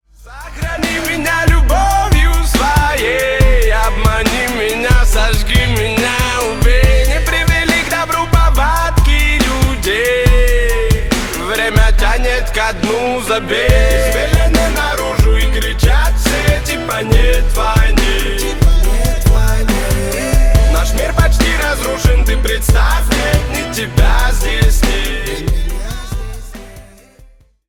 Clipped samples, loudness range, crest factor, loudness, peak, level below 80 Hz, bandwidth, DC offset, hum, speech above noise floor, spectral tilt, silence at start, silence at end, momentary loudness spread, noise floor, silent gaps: under 0.1%; 2 LU; 12 dB; -14 LUFS; 0 dBFS; -14 dBFS; 18 kHz; under 0.1%; none; 33 dB; -4.5 dB/octave; 0.2 s; 0.85 s; 5 LU; -43 dBFS; none